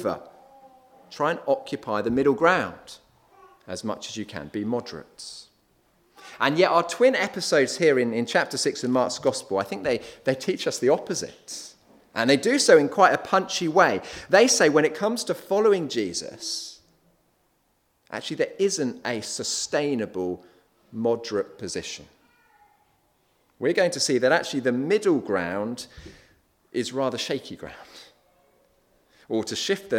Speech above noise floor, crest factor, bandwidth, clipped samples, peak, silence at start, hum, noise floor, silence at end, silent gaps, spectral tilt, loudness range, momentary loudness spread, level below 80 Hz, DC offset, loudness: 45 dB; 24 dB; 16.5 kHz; under 0.1%; -2 dBFS; 0 s; none; -69 dBFS; 0 s; none; -3.5 dB/octave; 11 LU; 17 LU; -64 dBFS; under 0.1%; -24 LUFS